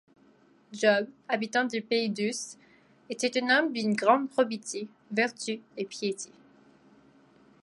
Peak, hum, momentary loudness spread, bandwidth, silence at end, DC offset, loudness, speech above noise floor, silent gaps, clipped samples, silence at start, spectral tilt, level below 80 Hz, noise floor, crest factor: -8 dBFS; none; 14 LU; 11.5 kHz; 1.4 s; under 0.1%; -28 LUFS; 33 dB; none; under 0.1%; 0.7 s; -3.5 dB/octave; -80 dBFS; -61 dBFS; 22 dB